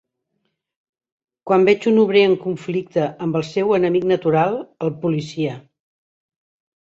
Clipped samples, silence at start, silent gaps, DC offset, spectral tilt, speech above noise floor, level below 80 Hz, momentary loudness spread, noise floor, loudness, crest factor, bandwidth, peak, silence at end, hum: under 0.1%; 1.45 s; none; under 0.1%; -7 dB/octave; 56 dB; -62 dBFS; 10 LU; -73 dBFS; -19 LUFS; 16 dB; 7.8 kHz; -4 dBFS; 1.25 s; none